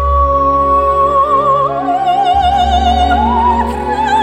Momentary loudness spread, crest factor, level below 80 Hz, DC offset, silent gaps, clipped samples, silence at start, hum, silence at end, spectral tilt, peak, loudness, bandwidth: 4 LU; 10 dB; -22 dBFS; under 0.1%; none; under 0.1%; 0 s; none; 0 s; -6 dB/octave; -2 dBFS; -11 LUFS; 12 kHz